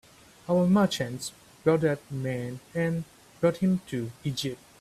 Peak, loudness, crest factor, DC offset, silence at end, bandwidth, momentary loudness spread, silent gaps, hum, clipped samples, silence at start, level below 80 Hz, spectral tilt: -10 dBFS; -28 LUFS; 18 dB; under 0.1%; 0.25 s; 14.5 kHz; 12 LU; none; none; under 0.1%; 0.5 s; -62 dBFS; -6 dB/octave